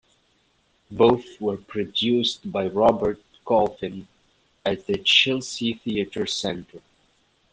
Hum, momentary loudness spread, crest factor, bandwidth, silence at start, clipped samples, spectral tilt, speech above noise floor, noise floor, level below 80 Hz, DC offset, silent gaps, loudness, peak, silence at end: none; 14 LU; 20 dB; 9.8 kHz; 0.9 s; under 0.1%; -4 dB/octave; 42 dB; -65 dBFS; -56 dBFS; under 0.1%; none; -23 LUFS; -4 dBFS; 0.75 s